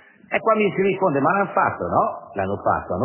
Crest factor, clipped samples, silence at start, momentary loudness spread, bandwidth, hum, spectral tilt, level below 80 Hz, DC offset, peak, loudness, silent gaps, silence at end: 16 dB; under 0.1%; 0.3 s; 7 LU; 3.2 kHz; none; -10.5 dB/octave; -50 dBFS; under 0.1%; -4 dBFS; -21 LUFS; none; 0 s